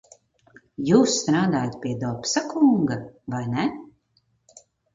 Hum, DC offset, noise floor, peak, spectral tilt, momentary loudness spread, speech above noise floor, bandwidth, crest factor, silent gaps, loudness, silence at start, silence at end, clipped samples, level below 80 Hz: none; under 0.1%; -68 dBFS; -4 dBFS; -5 dB/octave; 13 LU; 46 dB; 7.6 kHz; 20 dB; none; -23 LUFS; 0.8 s; 1.1 s; under 0.1%; -60 dBFS